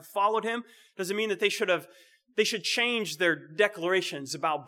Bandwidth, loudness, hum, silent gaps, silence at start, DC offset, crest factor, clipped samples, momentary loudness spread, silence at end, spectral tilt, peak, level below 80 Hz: 18 kHz; -28 LUFS; none; none; 0 s; under 0.1%; 20 dB; under 0.1%; 8 LU; 0 s; -2.5 dB/octave; -8 dBFS; under -90 dBFS